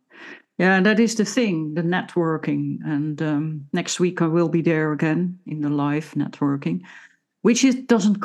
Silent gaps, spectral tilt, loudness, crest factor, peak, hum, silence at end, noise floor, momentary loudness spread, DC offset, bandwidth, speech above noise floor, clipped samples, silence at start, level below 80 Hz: none; -5.5 dB/octave; -21 LUFS; 18 dB; -4 dBFS; none; 0 s; -43 dBFS; 9 LU; under 0.1%; 12.5 kHz; 23 dB; under 0.1%; 0.15 s; -78 dBFS